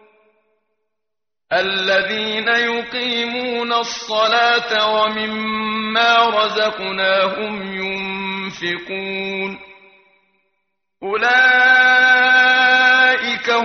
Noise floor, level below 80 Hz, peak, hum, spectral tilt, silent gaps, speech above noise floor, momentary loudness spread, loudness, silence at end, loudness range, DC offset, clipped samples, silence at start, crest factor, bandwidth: -84 dBFS; -62 dBFS; -2 dBFS; none; 0.5 dB/octave; none; 68 dB; 13 LU; -15 LUFS; 0 s; 11 LU; under 0.1%; under 0.1%; 1.5 s; 16 dB; 6.6 kHz